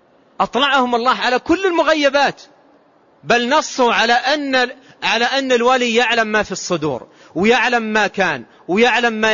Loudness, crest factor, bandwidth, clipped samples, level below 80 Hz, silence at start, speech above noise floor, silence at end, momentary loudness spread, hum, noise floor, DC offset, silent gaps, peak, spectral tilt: -16 LUFS; 14 dB; 7.4 kHz; under 0.1%; -54 dBFS; 0.4 s; 36 dB; 0 s; 7 LU; none; -52 dBFS; 0.1%; none; -4 dBFS; -3 dB/octave